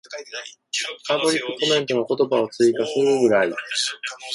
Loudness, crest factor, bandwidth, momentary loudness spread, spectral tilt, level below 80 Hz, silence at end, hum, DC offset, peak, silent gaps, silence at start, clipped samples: -21 LUFS; 16 dB; 11.5 kHz; 13 LU; -3 dB/octave; -68 dBFS; 0 s; none; under 0.1%; -6 dBFS; none; 0.1 s; under 0.1%